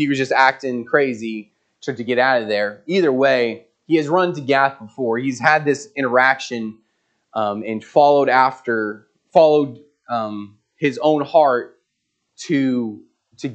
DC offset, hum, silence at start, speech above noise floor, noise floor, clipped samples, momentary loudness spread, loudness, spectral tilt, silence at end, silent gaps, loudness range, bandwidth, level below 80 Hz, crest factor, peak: under 0.1%; none; 0 s; 56 dB; -74 dBFS; under 0.1%; 14 LU; -18 LUFS; -5.5 dB/octave; 0 s; none; 3 LU; 8.8 kHz; -72 dBFS; 18 dB; 0 dBFS